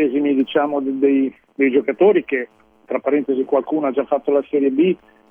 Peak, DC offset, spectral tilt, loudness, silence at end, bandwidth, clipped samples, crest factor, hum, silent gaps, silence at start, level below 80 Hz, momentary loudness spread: -4 dBFS; under 0.1%; -9 dB/octave; -18 LUFS; 0.35 s; 3.6 kHz; under 0.1%; 14 dB; none; none; 0 s; -66 dBFS; 9 LU